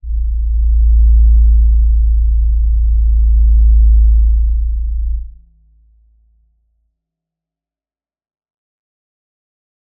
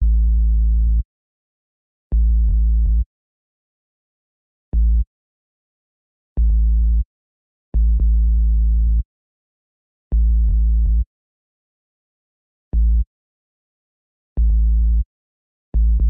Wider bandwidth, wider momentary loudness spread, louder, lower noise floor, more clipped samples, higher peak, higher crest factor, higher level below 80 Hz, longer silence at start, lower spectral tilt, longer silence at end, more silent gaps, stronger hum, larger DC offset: second, 0.2 kHz vs 0.7 kHz; second, 9 LU vs 12 LU; first, -13 LUFS vs -20 LUFS; about the same, under -90 dBFS vs under -90 dBFS; neither; first, -2 dBFS vs -10 dBFS; about the same, 10 dB vs 8 dB; first, -12 dBFS vs -18 dBFS; about the same, 0.05 s vs 0 s; first, -17.5 dB/octave vs -15 dB/octave; first, 4.7 s vs 0 s; second, none vs 1.05-2.10 s, 3.06-4.72 s, 5.07-6.36 s, 7.05-7.72 s, 9.05-10.10 s, 11.06-12.71 s, 13.07-14.36 s, 15.05-15.72 s; neither; neither